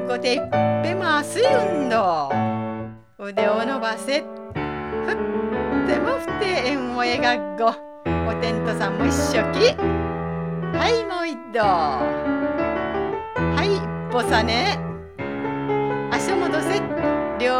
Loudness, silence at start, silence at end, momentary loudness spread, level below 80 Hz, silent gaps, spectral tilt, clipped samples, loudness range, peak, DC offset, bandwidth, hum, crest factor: -22 LUFS; 0 s; 0 s; 8 LU; -44 dBFS; none; -5 dB/octave; under 0.1%; 2 LU; -4 dBFS; 0.2%; 15.5 kHz; none; 18 dB